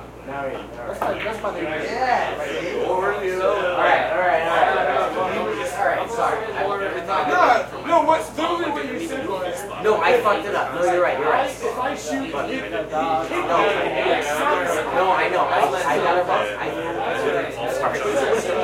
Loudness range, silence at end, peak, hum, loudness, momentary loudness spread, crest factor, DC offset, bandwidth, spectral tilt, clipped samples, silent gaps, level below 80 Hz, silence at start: 2 LU; 0 s; -4 dBFS; none; -21 LUFS; 8 LU; 18 dB; under 0.1%; 16.5 kHz; -4 dB/octave; under 0.1%; none; -50 dBFS; 0 s